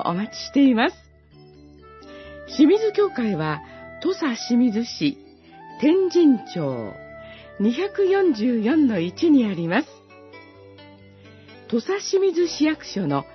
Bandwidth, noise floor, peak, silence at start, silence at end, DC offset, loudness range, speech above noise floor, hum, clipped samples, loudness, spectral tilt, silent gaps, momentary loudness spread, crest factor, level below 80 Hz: 6.2 kHz; -49 dBFS; -6 dBFS; 0 s; 0.1 s; under 0.1%; 4 LU; 29 dB; none; under 0.1%; -21 LUFS; -6 dB/octave; none; 20 LU; 16 dB; -60 dBFS